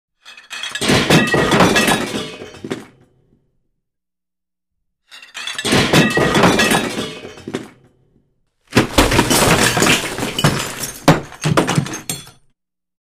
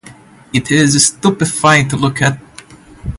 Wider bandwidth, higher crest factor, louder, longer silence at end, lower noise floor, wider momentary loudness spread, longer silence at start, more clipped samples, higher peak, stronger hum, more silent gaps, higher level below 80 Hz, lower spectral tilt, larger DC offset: first, 16 kHz vs 11.5 kHz; about the same, 18 dB vs 14 dB; second, -15 LUFS vs -12 LUFS; first, 0.9 s vs 0 s; first, -87 dBFS vs -39 dBFS; first, 17 LU vs 9 LU; first, 0.25 s vs 0.05 s; neither; about the same, 0 dBFS vs 0 dBFS; neither; neither; about the same, -36 dBFS vs -38 dBFS; about the same, -4 dB/octave vs -4 dB/octave; neither